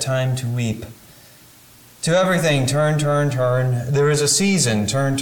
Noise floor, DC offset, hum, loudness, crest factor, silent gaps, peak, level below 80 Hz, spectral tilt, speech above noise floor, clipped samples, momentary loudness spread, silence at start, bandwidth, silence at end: -47 dBFS; under 0.1%; none; -18 LUFS; 14 dB; none; -6 dBFS; -50 dBFS; -4.5 dB/octave; 29 dB; under 0.1%; 8 LU; 0 s; 19 kHz; 0 s